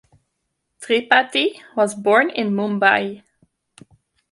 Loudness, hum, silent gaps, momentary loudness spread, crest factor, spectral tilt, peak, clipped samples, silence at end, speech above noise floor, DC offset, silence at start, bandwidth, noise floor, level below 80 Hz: -18 LUFS; none; none; 7 LU; 20 dB; -4 dB/octave; 0 dBFS; under 0.1%; 1.15 s; 57 dB; under 0.1%; 0.8 s; 11.5 kHz; -75 dBFS; -68 dBFS